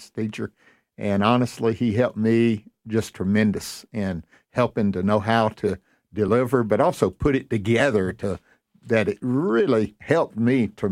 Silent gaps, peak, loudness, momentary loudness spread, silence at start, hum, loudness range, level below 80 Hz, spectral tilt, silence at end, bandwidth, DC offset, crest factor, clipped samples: none; -4 dBFS; -23 LUFS; 10 LU; 0 s; none; 2 LU; -48 dBFS; -7 dB/octave; 0 s; 15.5 kHz; under 0.1%; 18 dB; under 0.1%